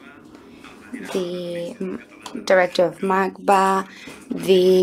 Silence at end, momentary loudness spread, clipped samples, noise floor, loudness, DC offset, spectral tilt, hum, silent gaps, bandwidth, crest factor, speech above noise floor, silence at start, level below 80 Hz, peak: 0 s; 19 LU; under 0.1%; -44 dBFS; -20 LUFS; under 0.1%; -5.5 dB/octave; none; none; 15.5 kHz; 18 dB; 24 dB; 0.05 s; -64 dBFS; -2 dBFS